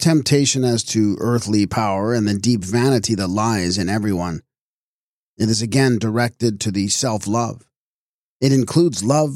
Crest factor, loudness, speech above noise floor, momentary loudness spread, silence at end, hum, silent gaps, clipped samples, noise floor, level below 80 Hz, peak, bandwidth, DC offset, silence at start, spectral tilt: 16 dB; -18 LUFS; over 72 dB; 6 LU; 0 s; none; 4.61-5.37 s, 7.77-8.40 s; under 0.1%; under -90 dBFS; -52 dBFS; -4 dBFS; 15.5 kHz; under 0.1%; 0 s; -5 dB/octave